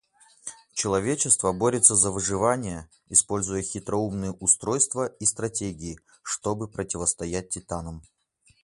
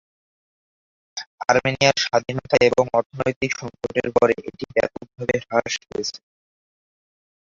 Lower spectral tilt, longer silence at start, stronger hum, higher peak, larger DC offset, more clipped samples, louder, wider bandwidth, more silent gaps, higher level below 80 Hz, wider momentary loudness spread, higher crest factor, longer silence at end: about the same, -3.5 dB/octave vs -4 dB/octave; second, 0.45 s vs 1.15 s; neither; about the same, 0 dBFS vs -2 dBFS; neither; neither; second, -24 LUFS vs -21 LUFS; first, 11.5 kHz vs 7.6 kHz; second, none vs 1.26-1.38 s, 3.06-3.10 s, 3.36-3.41 s; about the same, -50 dBFS vs -54 dBFS; first, 17 LU vs 11 LU; about the same, 26 dB vs 22 dB; second, 0.6 s vs 1.35 s